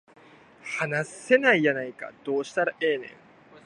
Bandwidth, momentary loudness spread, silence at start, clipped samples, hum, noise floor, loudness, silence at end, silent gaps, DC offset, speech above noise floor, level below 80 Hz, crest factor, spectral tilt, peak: 11 kHz; 17 LU; 0.65 s; under 0.1%; none; -53 dBFS; -25 LUFS; 0.05 s; none; under 0.1%; 27 dB; -76 dBFS; 22 dB; -5 dB/octave; -4 dBFS